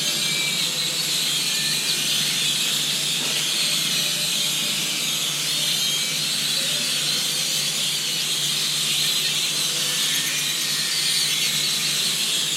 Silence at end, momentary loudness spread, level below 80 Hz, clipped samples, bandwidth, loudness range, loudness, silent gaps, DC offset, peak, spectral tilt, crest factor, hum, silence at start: 0 s; 2 LU; -80 dBFS; under 0.1%; 16 kHz; 1 LU; -20 LUFS; none; under 0.1%; -8 dBFS; 0 dB/octave; 14 dB; none; 0 s